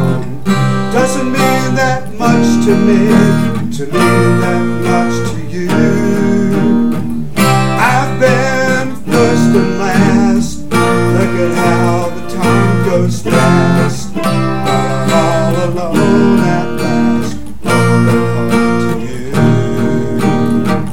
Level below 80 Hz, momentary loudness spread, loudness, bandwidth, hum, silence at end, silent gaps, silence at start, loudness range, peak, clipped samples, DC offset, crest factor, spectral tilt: -34 dBFS; 6 LU; -12 LUFS; 17 kHz; none; 0 s; none; 0 s; 2 LU; 0 dBFS; under 0.1%; 10%; 12 dB; -6.5 dB/octave